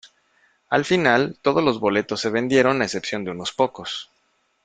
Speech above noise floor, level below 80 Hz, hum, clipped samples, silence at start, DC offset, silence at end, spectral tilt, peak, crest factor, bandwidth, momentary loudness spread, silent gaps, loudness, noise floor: 46 dB; -60 dBFS; none; under 0.1%; 0.05 s; under 0.1%; 0.6 s; -4.5 dB/octave; -2 dBFS; 20 dB; 9.4 kHz; 10 LU; none; -21 LUFS; -67 dBFS